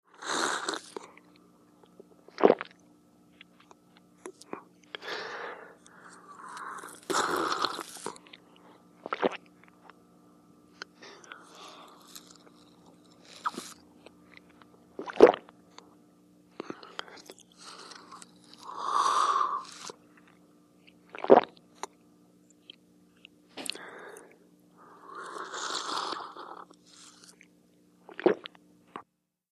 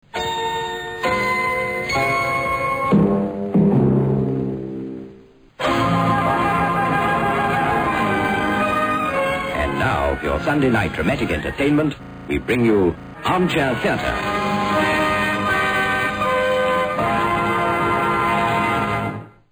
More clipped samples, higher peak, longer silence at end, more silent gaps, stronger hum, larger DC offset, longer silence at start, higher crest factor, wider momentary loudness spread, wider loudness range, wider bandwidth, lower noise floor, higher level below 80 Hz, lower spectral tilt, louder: neither; first, -2 dBFS vs -6 dBFS; first, 0.5 s vs 0.2 s; neither; first, 60 Hz at -70 dBFS vs none; neither; about the same, 0.2 s vs 0.15 s; first, 32 dB vs 14 dB; first, 27 LU vs 7 LU; first, 15 LU vs 1 LU; second, 14.5 kHz vs over 20 kHz; first, -65 dBFS vs -45 dBFS; second, -78 dBFS vs -40 dBFS; second, -3 dB/octave vs -6 dB/octave; second, -29 LUFS vs -19 LUFS